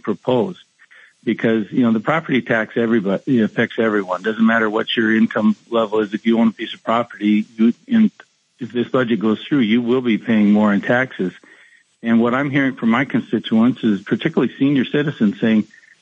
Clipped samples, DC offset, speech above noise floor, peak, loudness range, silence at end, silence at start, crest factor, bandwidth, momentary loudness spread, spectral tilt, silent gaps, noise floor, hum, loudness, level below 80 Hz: under 0.1%; under 0.1%; 34 dB; -2 dBFS; 1 LU; 0.35 s; 0.05 s; 16 dB; 7.2 kHz; 5 LU; -7.5 dB/octave; none; -51 dBFS; none; -18 LUFS; -72 dBFS